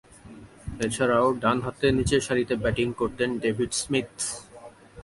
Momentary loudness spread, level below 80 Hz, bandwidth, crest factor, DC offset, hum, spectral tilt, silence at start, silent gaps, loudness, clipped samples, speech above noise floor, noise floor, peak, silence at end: 9 LU; -46 dBFS; 11.5 kHz; 18 dB; under 0.1%; none; -4.5 dB/octave; 0.25 s; none; -25 LUFS; under 0.1%; 22 dB; -47 dBFS; -8 dBFS; 0 s